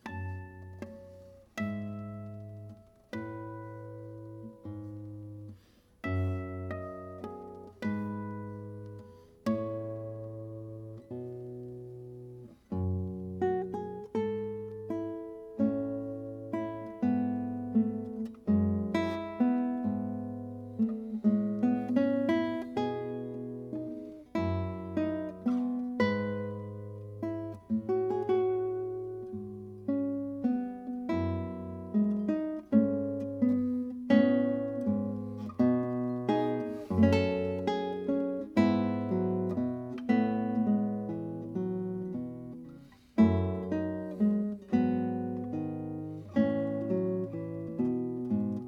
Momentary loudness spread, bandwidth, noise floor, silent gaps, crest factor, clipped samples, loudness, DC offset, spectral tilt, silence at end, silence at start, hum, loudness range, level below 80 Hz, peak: 16 LU; 7 kHz; -60 dBFS; none; 20 dB; under 0.1%; -32 LUFS; under 0.1%; -9 dB/octave; 0 s; 0.05 s; none; 11 LU; -64 dBFS; -12 dBFS